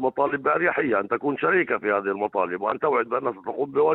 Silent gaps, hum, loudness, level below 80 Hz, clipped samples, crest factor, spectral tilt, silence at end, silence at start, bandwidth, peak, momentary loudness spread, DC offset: none; none; -24 LUFS; -66 dBFS; under 0.1%; 16 dB; -9 dB/octave; 0 s; 0 s; 4.1 kHz; -8 dBFS; 5 LU; under 0.1%